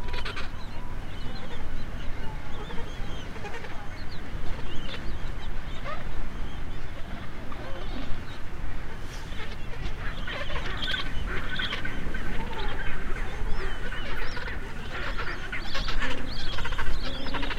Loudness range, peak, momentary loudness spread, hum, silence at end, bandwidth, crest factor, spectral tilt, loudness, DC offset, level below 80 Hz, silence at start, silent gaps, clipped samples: 6 LU; -8 dBFS; 9 LU; none; 0 s; 7.2 kHz; 16 dB; -5 dB/octave; -35 LUFS; under 0.1%; -32 dBFS; 0 s; none; under 0.1%